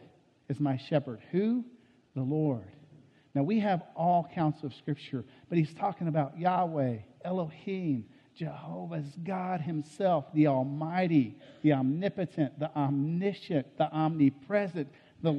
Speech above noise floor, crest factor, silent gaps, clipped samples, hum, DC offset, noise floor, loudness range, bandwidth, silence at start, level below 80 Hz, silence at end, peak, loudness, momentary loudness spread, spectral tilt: 29 dB; 18 dB; none; under 0.1%; none; under 0.1%; -59 dBFS; 4 LU; 9.2 kHz; 0.5 s; -74 dBFS; 0 s; -14 dBFS; -31 LUFS; 12 LU; -9 dB/octave